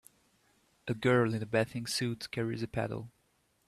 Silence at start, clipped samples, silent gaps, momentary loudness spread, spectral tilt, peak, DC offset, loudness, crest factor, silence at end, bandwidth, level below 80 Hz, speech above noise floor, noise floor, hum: 0.85 s; under 0.1%; none; 13 LU; -5.5 dB/octave; -14 dBFS; under 0.1%; -33 LUFS; 20 dB; 0.6 s; 14.5 kHz; -64 dBFS; 41 dB; -73 dBFS; none